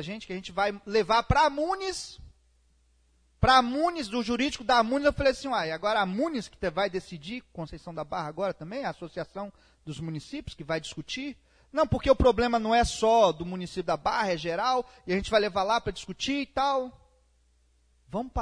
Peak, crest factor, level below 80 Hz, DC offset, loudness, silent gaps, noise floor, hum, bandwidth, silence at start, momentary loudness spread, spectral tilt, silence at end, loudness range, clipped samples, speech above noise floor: -6 dBFS; 22 dB; -44 dBFS; under 0.1%; -27 LUFS; none; -66 dBFS; none; 10.5 kHz; 0 s; 16 LU; -5 dB/octave; 0 s; 10 LU; under 0.1%; 38 dB